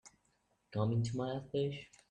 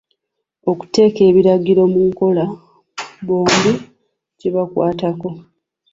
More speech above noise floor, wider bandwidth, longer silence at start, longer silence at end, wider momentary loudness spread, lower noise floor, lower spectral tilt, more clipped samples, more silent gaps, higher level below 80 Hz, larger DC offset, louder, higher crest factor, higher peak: second, 40 dB vs 62 dB; first, 9.4 kHz vs 7.8 kHz; second, 0.05 s vs 0.65 s; second, 0.25 s vs 0.5 s; second, 8 LU vs 18 LU; about the same, -77 dBFS vs -76 dBFS; first, -7 dB/octave vs -5.5 dB/octave; neither; neither; second, -68 dBFS vs -54 dBFS; neither; second, -38 LUFS vs -15 LUFS; about the same, 16 dB vs 14 dB; second, -22 dBFS vs -2 dBFS